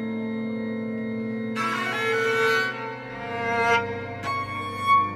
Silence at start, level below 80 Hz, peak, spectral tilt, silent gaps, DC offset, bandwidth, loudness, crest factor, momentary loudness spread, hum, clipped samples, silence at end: 0 s; -62 dBFS; -10 dBFS; -5 dB/octave; none; under 0.1%; 15 kHz; -26 LUFS; 16 dB; 10 LU; none; under 0.1%; 0 s